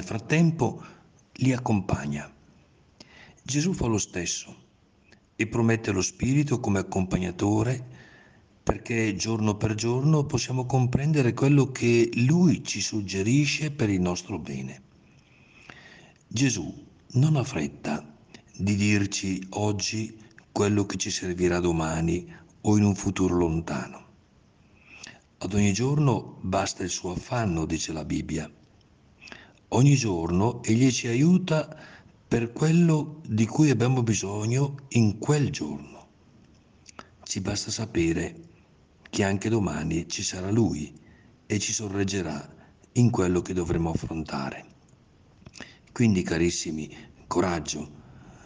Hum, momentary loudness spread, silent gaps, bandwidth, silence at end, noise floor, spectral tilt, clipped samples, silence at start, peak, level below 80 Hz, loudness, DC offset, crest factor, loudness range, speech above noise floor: none; 13 LU; none; 10 kHz; 0.15 s; -60 dBFS; -5.5 dB/octave; under 0.1%; 0 s; -6 dBFS; -52 dBFS; -26 LUFS; under 0.1%; 20 dB; 6 LU; 35 dB